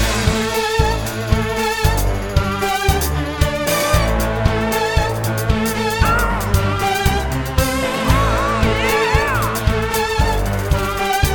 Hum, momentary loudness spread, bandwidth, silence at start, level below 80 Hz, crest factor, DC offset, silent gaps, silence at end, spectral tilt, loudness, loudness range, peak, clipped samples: none; 4 LU; 19.5 kHz; 0 s; -22 dBFS; 16 dB; under 0.1%; none; 0 s; -4.5 dB/octave; -18 LUFS; 1 LU; -2 dBFS; under 0.1%